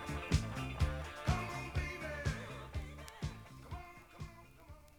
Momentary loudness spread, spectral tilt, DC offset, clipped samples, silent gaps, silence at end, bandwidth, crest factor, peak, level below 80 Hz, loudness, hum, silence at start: 16 LU; -5.5 dB/octave; under 0.1%; under 0.1%; none; 0 s; 20 kHz; 22 dB; -20 dBFS; -46 dBFS; -41 LUFS; none; 0 s